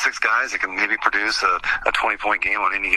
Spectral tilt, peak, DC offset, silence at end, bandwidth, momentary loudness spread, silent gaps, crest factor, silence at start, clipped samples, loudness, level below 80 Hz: -1 dB/octave; 0 dBFS; under 0.1%; 0 s; 13.5 kHz; 2 LU; none; 20 dB; 0 s; under 0.1%; -19 LUFS; -48 dBFS